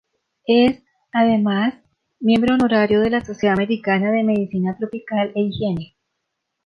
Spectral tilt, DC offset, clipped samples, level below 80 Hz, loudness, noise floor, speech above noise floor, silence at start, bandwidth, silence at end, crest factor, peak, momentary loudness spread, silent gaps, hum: -7.5 dB/octave; under 0.1%; under 0.1%; -52 dBFS; -19 LUFS; -77 dBFS; 59 dB; 0.5 s; 6.6 kHz; 0.8 s; 14 dB; -4 dBFS; 8 LU; none; none